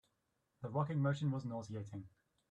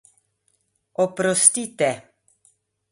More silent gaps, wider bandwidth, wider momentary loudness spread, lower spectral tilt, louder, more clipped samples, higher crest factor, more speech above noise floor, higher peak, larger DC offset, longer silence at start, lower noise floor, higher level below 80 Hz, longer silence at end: neither; second, 8.4 kHz vs 11.5 kHz; about the same, 14 LU vs 16 LU; first, -8 dB/octave vs -2.5 dB/octave; second, -40 LUFS vs -19 LUFS; neither; second, 16 dB vs 24 dB; second, 44 dB vs 49 dB; second, -24 dBFS vs 0 dBFS; neither; second, 0.6 s vs 1 s; first, -83 dBFS vs -69 dBFS; second, -76 dBFS vs -70 dBFS; second, 0.45 s vs 0.9 s